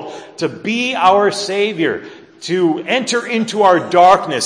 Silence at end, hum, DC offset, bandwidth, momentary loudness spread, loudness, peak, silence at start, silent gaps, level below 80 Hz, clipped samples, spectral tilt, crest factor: 0 s; none; under 0.1%; 10.5 kHz; 13 LU; -14 LUFS; 0 dBFS; 0 s; none; -58 dBFS; under 0.1%; -4 dB/octave; 14 dB